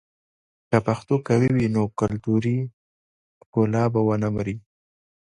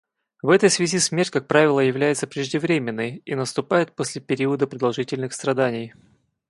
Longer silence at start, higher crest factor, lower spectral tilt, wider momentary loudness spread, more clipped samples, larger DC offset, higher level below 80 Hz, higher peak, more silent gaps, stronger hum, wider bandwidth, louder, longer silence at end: first, 0.7 s vs 0.45 s; about the same, 20 dB vs 20 dB; first, -8.5 dB/octave vs -4.5 dB/octave; about the same, 8 LU vs 10 LU; neither; neither; first, -52 dBFS vs -66 dBFS; about the same, -4 dBFS vs -2 dBFS; first, 2.73-3.53 s vs none; neither; second, 10 kHz vs 11.5 kHz; about the same, -23 LUFS vs -21 LUFS; first, 0.8 s vs 0.6 s